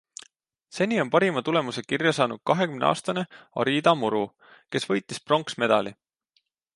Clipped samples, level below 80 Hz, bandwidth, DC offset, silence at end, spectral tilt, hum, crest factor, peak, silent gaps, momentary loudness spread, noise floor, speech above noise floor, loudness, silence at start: under 0.1%; -70 dBFS; 11.5 kHz; under 0.1%; 0.85 s; -5 dB/octave; none; 22 dB; -4 dBFS; none; 11 LU; -72 dBFS; 47 dB; -25 LUFS; 0.75 s